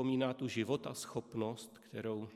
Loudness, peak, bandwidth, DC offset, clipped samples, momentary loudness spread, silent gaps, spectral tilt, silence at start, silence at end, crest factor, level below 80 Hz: -40 LUFS; -20 dBFS; 15.5 kHz; under 0.1%; under 0.1%; 9 LU; none; -5.5 dB/octave; 0 s; 0 s; 18 dB; -76 dBFS